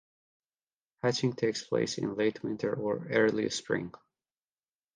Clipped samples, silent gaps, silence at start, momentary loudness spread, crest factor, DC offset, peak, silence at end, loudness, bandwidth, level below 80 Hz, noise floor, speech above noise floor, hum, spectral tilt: under 0.1%; none; 1.05 s; 7 LU; 20 dB; under 0.1%; -12 dBFS; 1.05 s; -31 LUFS; 10 kHz; -70 dBFS; under -90 dBFS; over 60 dB; none; -5 dB/octave